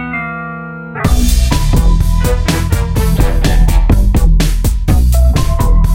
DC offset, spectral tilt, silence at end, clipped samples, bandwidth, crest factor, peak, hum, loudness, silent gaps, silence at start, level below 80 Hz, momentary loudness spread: under 0.1%; -5.5 dB/octave; 0 s; under 0.1%; 16.5 kHz; 10 dB; 0 dBFS; none; -13 LUFS; none; 0 s; -10 dBFS; 8 LU